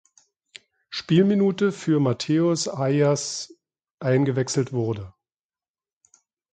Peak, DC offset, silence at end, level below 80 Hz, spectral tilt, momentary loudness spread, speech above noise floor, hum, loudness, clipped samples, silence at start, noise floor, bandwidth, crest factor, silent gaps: -6 dBFS; under 0.1%; 1.45 s; -62 dBFS; -6 dB/octave; 13 LU; over 68 dB; none; -23 LUFS; under 0.1%; 0.9 s; under -90 dBFS; 9.4 kHz; 18 dB; 3.91-3.98 s